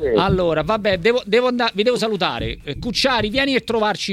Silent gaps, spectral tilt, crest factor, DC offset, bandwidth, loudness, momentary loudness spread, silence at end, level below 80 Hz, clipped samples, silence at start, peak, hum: none; -5 dB/octave; 16 dB; under 0.1%; 14 kHz; -19 LUFS; 5 LU; 0 s; -38 dBFS; under 0.1%; 0 s; -4 dBFS; none